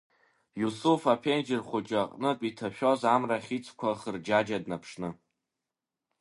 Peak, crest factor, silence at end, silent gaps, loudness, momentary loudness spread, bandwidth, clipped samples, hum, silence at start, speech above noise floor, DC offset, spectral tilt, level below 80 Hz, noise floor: -10 dBFS; 22 dB; 1.05 s; none; -30 LUFS; 11 LU; 11.5 kHz; under 0.1%; none; 0.55 s; 60 dB; under 0.1%; -5.5 dB/octave; -70 dBFS; -89 dBFS